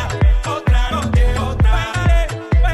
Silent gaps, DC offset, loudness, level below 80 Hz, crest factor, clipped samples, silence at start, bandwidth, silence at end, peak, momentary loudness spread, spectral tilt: none; under 0.1%; -17 LUFS; -16 dBFS; 10 dB; under 0.1%; 0 s; 12 kHz; 0 s; -4 dBFS; 2 LU; -6 dB/octave